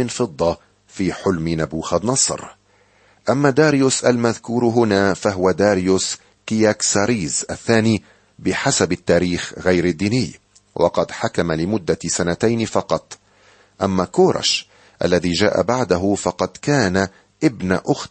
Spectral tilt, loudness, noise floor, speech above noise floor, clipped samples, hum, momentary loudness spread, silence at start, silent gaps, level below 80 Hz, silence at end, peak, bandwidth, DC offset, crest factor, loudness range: -4.5 dB/octave; -19 LUFS; -56 dBFS; 38 dB; under 0.1%; none; 8 LU; 0 s; none; -48 dBFS; 0.05 s; -2 dBFS; 8.8 kHz; under 0.1%; 18 dB; 4 LU